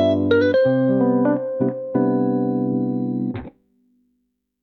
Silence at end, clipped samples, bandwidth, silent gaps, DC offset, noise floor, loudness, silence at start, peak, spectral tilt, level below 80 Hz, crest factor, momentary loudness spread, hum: 1.15 s; under 0.1%; 5.8 kHz; none; under 0.1%; -72 dBFS; -20 LUFS; 0 s; -6 dBFS; -9.5 dB/octave; -58 dBFS; 14 dB; 7 LU; none